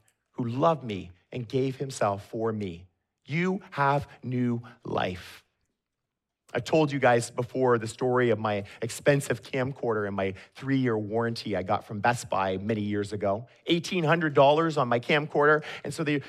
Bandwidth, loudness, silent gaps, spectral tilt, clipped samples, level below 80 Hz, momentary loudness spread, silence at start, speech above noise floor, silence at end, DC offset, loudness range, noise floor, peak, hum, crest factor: 14.5 kHz; -27 LUFS; none; -6 dB/octave; under 0.1%; -66 dBFS; 12 LU; 0.4 s; 58 dB; 0 s; under 0.1%; 6 LU; -85 dBFS; -8 dBFS; none; 20 dB